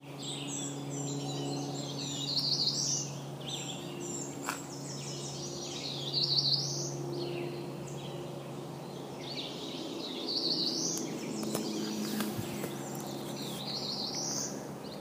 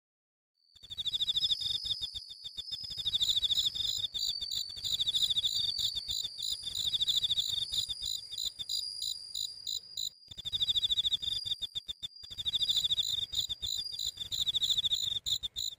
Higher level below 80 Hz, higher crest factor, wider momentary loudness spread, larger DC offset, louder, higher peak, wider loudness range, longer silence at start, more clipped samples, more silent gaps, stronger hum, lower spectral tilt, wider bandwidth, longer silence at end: second, -70 dBFS vs -60 dBFS; about the same, 22 dB vs 18 dB; about the same, 12 LU vs 10 LU; neither; second, -35 LUFS vs -31 LUFS; first, -14 dBFS vs -18 dBFS; about the same, 5 LU vs 3 LU; second, 0 s vs 0.85 s; neither; neither; neither; first, -3 dB/octave vs 1 dB/octave; about the same, 15.5 kHz vs 16 kHz; about the same, 0 s vs 0.05 s